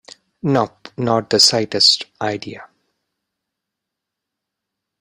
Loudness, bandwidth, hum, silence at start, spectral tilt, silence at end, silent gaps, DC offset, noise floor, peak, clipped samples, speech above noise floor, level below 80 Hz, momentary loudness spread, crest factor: -16 LUFS; 15.5 kHz; none; 0.45 s; -3 dB/octave; 2.35 s; none; under 0.1%; -82 dBFS; 0 dBFS; under 0.1%; 65 dB; -60 dBFS; 14 LU; 20 dB